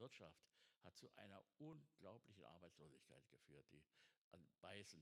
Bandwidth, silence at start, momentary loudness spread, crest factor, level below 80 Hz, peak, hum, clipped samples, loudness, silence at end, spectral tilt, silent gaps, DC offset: 12.5 kHz; 0 s; 8 LU; 22 dB; under -90 dBFS; -42 dBFS; none; under 0.1%; -65 LUFS; 0 s; -4.5 dB/octave; 4.17-4.31 s; under 0.1%